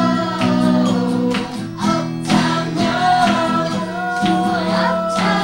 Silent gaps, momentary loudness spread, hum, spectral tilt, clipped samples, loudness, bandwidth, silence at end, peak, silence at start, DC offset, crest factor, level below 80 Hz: none; 6 LU; none; -5.5 dB/octave; under 0.1%; -17 LUFS; 16 kHz; 0 s; -2 dBFS; 0 s; under 0.1%; 14 dB; -48 dBFS